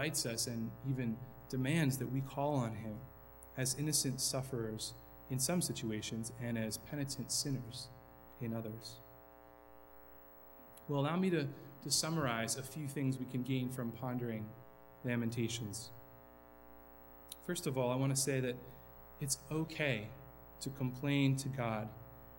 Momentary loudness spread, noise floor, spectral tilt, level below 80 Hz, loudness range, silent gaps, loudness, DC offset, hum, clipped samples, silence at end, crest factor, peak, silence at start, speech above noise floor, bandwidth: 22 LU; -59 dBFS; -4.5 dB/octave; -66 dBFS; 6 LU; none; -38 LUFS; under 0.1%; 60 Hz at -65 dBFS; under 0.1%; 0 s; 20 dB; -20 dBFS; 0 s; 21 dB; 18.5 kHz